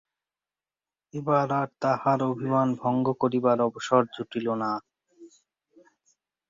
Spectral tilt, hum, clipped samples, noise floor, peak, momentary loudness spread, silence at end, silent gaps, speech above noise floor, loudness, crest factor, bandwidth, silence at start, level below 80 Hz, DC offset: -7 dB/octave; none; under 0.1%; under -90 dBFS; -8 dBFS; 8 LU; 1.25 s; none; over 65 dB; -26 LUFS; 20 dB; 7.6 kHz; 1.15 s; -70 dBFS; under 0.1%